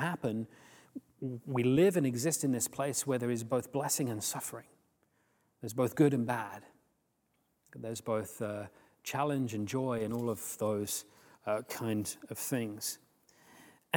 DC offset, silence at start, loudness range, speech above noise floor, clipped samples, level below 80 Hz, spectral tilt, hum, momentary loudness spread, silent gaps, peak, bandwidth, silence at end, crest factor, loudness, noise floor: under 0.1%; 0 s; 6 LU; 43 dB; under 0.1%; -74 dBFS; -5 dB/octave; none; 16 LU; none; -12 dBFS; 19.5 kHz; 0 s; 22 dB; -34 LUFS; -77 dBFS